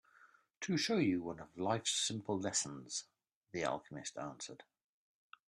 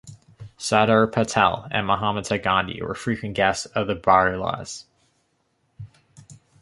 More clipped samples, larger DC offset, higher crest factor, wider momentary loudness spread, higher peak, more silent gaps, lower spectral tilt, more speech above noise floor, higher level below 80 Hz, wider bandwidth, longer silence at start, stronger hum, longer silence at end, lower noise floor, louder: neither; neither; about the same, 18 dB vs 22 dB; about the same, 13 LU vs 11 LU; second, -22 dBFS vs -2 dBFS; first, 0.57-0.61 s, 3.35-3.41 s vs none; about the same, -3.5 dB/octave vs -4.5 dB/octave; second, 29 dB vs 47 dB; second, -76 dBFS vs -50 dBFS; first, 13.5 kHz vs 11.5 kHz; first, 0.25 s vs 0.05 s; neither; first, 0.85 s vs 0.3 s; about the same, -67 dBFS vs -69 dBFS; second, -38 LUFS vs -22 LUFS